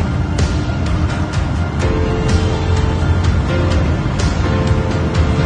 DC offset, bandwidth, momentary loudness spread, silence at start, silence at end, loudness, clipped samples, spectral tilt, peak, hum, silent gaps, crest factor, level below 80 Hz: under 0.1%; 9.6 kHz; 3 LU; 0 s; 0 s; -16 LUFS; under 0.1%; -6.5 dB/octave; -2 dBFS; none; none; 12 dB; -20 dBFS